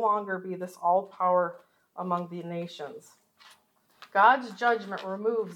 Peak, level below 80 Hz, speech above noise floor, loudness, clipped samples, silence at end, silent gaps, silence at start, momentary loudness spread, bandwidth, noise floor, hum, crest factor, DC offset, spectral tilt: -6 dBFS; under -90 dBFS; 37 dB; -28 LUFS; under 0.1%; 0 s; none; 0 s; 17 LU; 16.5 kHz; -65 dBFS; none; 22 dB; under 0.1%; -6 dB/octave